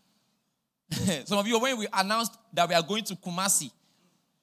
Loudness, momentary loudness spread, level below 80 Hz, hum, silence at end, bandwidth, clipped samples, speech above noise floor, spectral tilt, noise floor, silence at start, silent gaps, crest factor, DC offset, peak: -27 LUFS; 7 LU; -62 dBFS; none; 0.75 s; 16 kHz; under 0.1%; 51 dB; -3 dB/octave; -79 dBFS; 0.9 s; none; 22 dB; under 0.1%; -8 dBFS